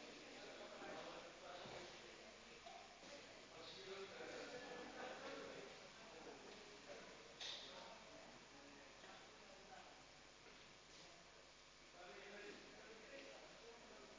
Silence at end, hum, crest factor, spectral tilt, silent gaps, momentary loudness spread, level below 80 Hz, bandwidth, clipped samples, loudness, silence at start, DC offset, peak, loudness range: 0 s; none; 18 dB; -2.5 dB/octave; none; 9 LU; -80 dBFS; 8 kHz; under 0.1%; -57 LUFS; 0 s; under 0.1%; -40 dBFS; 6 LU